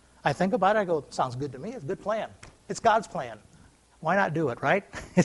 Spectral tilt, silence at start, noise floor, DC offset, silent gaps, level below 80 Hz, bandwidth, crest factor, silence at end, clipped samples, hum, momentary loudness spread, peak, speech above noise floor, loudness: -6 dB/octave; 0.25 s; -57 dBFS; under 0.1%; none; -60 dBFS; 11.5 kHz; 20 dB; 0 s; under 0.1%; none; 13 LU; -6 dBFS; 30 dB; -28 LUFS